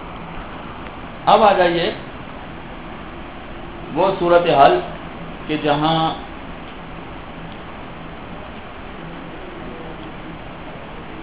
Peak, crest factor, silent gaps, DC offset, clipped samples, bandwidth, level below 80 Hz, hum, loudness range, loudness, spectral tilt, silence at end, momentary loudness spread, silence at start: 0 dBFS; 22 dB; none; 0.9%; under 0.1%; 4 kHz; -42 dBFS; none; 15 LU; -17 LUFS; -9.5 dB/octave; 0 s; 20 LU; 0 s